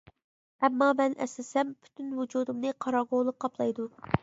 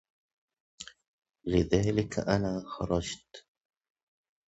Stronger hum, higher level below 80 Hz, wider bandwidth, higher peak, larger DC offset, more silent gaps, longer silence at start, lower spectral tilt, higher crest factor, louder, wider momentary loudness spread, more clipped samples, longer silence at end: neither; second, -62 dBFS vs -48 dBFS; about the same, 8 kHz vs 8.2 kHz; first, -6 dBFS vs -10 dBFS; neither; second, none vs 1.08-1.22 s; second, 0.6 s vs 0.8 s; about the same, -6 dB/octave vs -6 dB/octave; about the same, 24 dB vs 22 dB; about the same, -30 LUFS vs -30 LUFS; second, 10 LU vs 20 LU; neither; second, 0.05 s vs 1.1 s